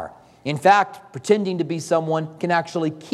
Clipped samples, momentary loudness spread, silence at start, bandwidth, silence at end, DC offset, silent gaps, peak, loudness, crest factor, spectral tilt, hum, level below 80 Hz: under 0.1%; 13 LU; 0 s; 13.5 kHz; 0 s; under 0.1%; none; -4 dBFS; -21 LUFS; 18 dB; -5.5 dB/octave; none; -68 dBFS